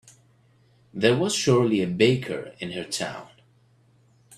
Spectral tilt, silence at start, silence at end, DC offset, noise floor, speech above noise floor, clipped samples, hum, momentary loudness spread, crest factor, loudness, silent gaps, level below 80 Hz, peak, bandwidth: -5 dB/octave; 0.95 s; 1.1 s; under 0.1%; -60 dBFS; 37 dB; under 0.1%; none; 13 LU; 22 dB; -24 LUFS; none; -62 dBFS; -4 dBFS; 13.5 kHz